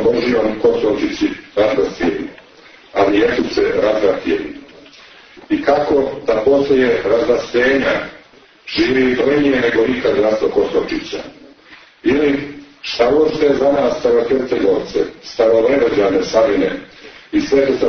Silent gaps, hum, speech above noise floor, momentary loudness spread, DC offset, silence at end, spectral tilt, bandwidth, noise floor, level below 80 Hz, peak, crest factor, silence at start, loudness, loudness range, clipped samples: none; none; 31 dB; 10 LU; under 0.1%; 0 s; -5.5 dB/octave; 6.6 kHz; -45 dBFS; -44 dBFS; -2 dBFS; 14 dB; 0 s; -15 LUFS; 3 LU; under 0.1%